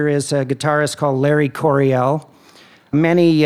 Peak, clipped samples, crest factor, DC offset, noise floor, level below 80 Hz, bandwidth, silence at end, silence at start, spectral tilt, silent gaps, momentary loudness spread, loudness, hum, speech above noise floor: -2 dBFS; under 0.1%; 14 dB; under 0.1%; -47 dBFS; -62 dBFS; 14.5 kHz; 0 s; 0 s; -6.5 dB/octave; none; 6 LU; -17 LUFS; none; 31 dB